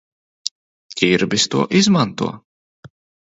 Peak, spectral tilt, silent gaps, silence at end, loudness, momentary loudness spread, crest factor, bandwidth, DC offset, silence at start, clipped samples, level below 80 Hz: 0 dBFS; -4 dB/octave; 0.51-0.89 s, 2.44-2.83 s; 0.35 s; -18 LUFS; 14 LU; 20 dB; 8 kHz; under 0.1%; 0.45 s; under 0.1%; -56 dBFS